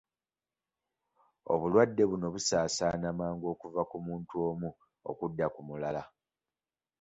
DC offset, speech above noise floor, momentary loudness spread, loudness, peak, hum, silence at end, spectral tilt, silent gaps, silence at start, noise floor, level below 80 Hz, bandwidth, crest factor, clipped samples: under 0.1%; over 58 dB; 13 LU; -33 LUFS; -12 dBFS; none; 0.95 s; -5 dB/octave; none; 1.45 s; under -90 dBFS; -62 dBFS; 8.4 kHz; 22 dB; under 0.1%